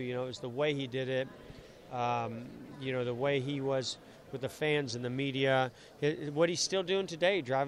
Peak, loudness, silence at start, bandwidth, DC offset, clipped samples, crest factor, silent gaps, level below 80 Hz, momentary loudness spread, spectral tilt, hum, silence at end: -16 dBFS; -33 LUFS; 0 s; 14 kHz; under 0.1%; under 0.1%; 18 dB; none; -68 dBFS; 14 LU; -4.5 dB/octave; none; 0 s